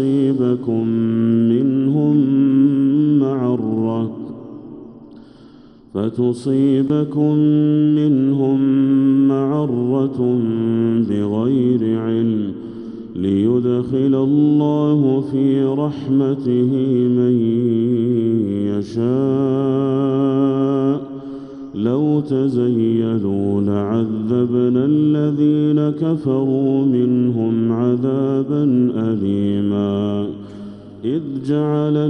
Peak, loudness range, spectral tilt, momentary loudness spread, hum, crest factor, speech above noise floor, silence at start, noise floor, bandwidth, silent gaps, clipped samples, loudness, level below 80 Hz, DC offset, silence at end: -4 dBFS; 4 LU; -10 dB/octave; 8 LU; none; 12 dB; 28 dB; 0 s; -43 dBFS; 5.8 kHz; none; under 0.1%; -17 LUFS; -58 dBFS; under 0.1%; 0 s